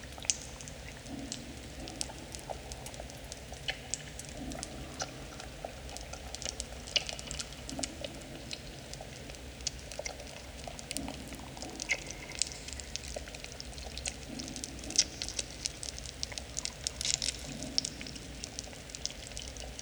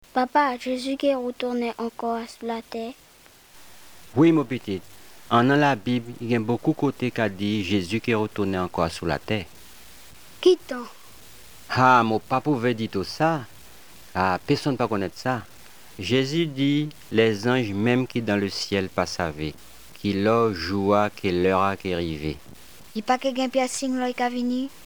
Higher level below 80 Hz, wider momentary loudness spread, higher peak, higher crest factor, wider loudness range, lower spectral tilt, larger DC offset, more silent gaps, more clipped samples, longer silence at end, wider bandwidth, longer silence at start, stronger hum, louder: about the same, -50 dBFS vs -54 dBFS; about the same, 12 LU vs 11 LU; about the same, -4 dBFS vs -4 dBFS; first, 36 dB vs 20 dB; about the same, 6 LU vs 4 LU; second, -1.5 dB/octave vs -5.5 dB/octave; second, under 0.1% vs 0.4%; neither; neither; second, 0 s vs 0.15 s; about the same, over 20 kHz vs over 20 kHz; second, 0 s vs 0.15 s; neither; second, -38 LUFS vs -24 LUFS